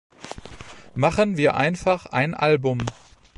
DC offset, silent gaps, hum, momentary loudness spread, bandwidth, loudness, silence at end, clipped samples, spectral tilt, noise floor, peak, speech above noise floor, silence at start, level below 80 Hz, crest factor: under 0.1%; none; none; 19 LU; 11.5 kHz; -22 LUFS; 0.45 s; under 0.1%; -6 dB/octave; -43 dBFS; -6 dBFS; 22 dB; 0.2 s; -48 dBFS; 18 dB